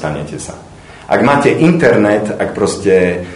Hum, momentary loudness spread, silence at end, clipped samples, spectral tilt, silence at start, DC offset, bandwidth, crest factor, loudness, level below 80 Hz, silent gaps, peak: none; 14 LU; 0 s; 0.2%; -6 dB/octave; 0 s; under 0.1%; 11 kHz; 12 dB; -12 LUFS; -42 dBFS; none; 0 dBFS